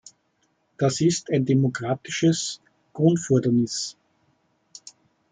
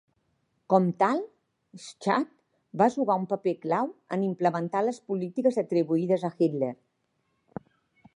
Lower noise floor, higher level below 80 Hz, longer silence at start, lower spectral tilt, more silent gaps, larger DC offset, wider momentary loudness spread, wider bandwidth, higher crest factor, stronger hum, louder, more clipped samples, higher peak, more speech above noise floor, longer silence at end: second, -69 dBFS vs -75 dBFS; first, -66 dBFS vs -76 dBFS; about the same, 0.8 s vs 0.7 s; second, -5.5 dB/octave vs -7.5 dB/octave; neither; neither; about the same, 20 LU vs 20 LU; second, 9.6 kHz vs 11 kHz; about the same, 18 dB vs 22 dB; neither; first, -23 LUFS vs -27 LUFS; neither; about the same, -6 dBFS vs -6 dBFS; about the same, 47 dB vs 49 dB; about the same, 1.4 s vs 1.4 s